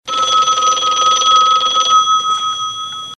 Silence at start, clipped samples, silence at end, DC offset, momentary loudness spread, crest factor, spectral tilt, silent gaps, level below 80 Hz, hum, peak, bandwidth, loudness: 0.05 s; under 0.1%; 0.05 s; under 0.1%; 9 LU; 14 dB; 1.5 dB/octave; none; -58 dBFS; none; 0 dBFS; 11.5 kHz; -12 LUFS